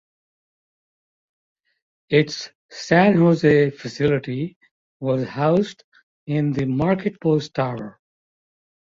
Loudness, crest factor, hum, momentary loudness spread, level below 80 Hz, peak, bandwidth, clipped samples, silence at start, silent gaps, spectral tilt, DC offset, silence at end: -20 LUFS; 20 dB; none; 16 LU; -56 dBFS; -2 dBFS; 7.6 kHz; under 0.1%; 2.1 s; 2.55-2.69 s, 4.56-4.61 s, 4.71-5.00 s, 5.84-5.92 s, 6.03-6.27 s; -7 dB/octave; under 0.1%; 0.95 s